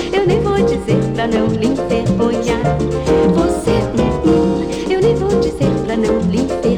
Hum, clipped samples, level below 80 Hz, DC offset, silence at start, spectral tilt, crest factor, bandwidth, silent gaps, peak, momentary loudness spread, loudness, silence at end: none; under 0.1%; -30 dBFS; 0.5%; 0 s; -7 dB/octave; 12 dB; 12.5 kHz; none; -2 dBFS; 3 LU; -15 LUFS; 0 s